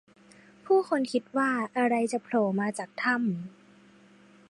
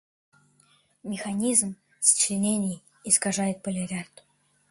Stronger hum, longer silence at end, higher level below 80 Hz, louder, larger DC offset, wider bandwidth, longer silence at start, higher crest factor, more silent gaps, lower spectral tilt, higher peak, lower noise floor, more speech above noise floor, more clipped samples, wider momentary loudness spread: neither; first, 1 s vs 0.65 s; second, -76 dBFS vs -68 dBFS; second, -28 LUFS vs -24 LUFS; neither; about the same, 11.5 kHz vs 12 kHz; second, 0.65 s vs 1.05 s; second, 16 dB vs 22 dB; neither; first, -5.5 dB/octave vs -3 dB/octave; second, -14 dBFS vs -6 dBFS; second, -57 dBFS vs -64 dBFS; second, 29 dB vs 38 dB; neither; second, 6 LU vs 16 LU